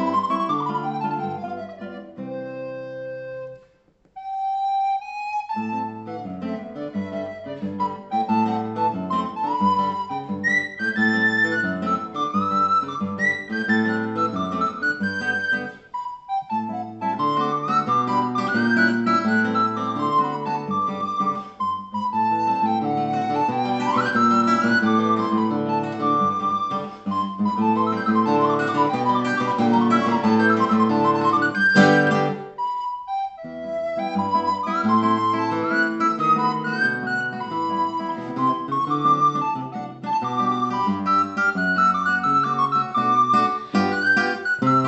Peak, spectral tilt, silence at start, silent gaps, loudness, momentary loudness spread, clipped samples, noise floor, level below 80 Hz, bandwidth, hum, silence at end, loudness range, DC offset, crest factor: -2 dBFS; -6 dB/octave; 0 s; none; -21 LUFS; 12 LU; under 0.1%; -59 dBFS; -66 dBFS; 8.4 kHz; none; 0 s; 8 LU; under 0.1%; 20 dB